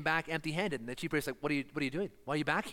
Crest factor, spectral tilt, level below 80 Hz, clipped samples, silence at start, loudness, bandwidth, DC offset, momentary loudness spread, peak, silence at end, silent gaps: 20 dB; -5 dB/octave; -62 dBFS; under 0.1%; 0 s; -35 LUFS; 17 kHz; under 0.1%; 4 LU; -16 dBFS; 0 s; none